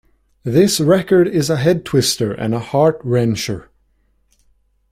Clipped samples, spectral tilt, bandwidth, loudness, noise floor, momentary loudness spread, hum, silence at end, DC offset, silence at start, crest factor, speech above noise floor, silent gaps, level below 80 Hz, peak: under 0.1%; -5.5 dB/octave; 16 kHz; -16 LUFS; -60 dBFS; 9 LU; none; 1.3 s; under 0.1%; 0.45 s; 16 dB; 45 dB; none; -48 dBFS; -2 dBFS